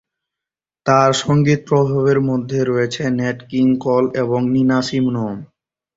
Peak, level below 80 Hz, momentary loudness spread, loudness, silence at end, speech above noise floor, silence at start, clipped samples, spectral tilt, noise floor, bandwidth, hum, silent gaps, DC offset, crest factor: -2 dBFS; -52 dBFS; 7 LU; -17 LUFS; 0.5 s; 71 dB; 0.85 s; under 0.1%; -6.5 dB/octave; -87 dBFS; 8 kHz; none; none; under 0.1%; 16 dB